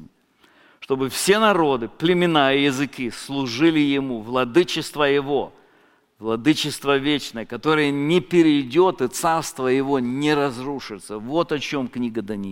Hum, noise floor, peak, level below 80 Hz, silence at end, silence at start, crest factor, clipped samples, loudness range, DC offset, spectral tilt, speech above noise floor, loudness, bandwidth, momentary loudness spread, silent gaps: none; -58 dBFS; -2 dBFS; -54 dBFS; 0 s; 0 s; 18 dB; under 0.1%; 3 LU; under 0.1%; -4.5 dB/octave; 38 dB; -21 LUFS; 17 kHz; 10 LU; none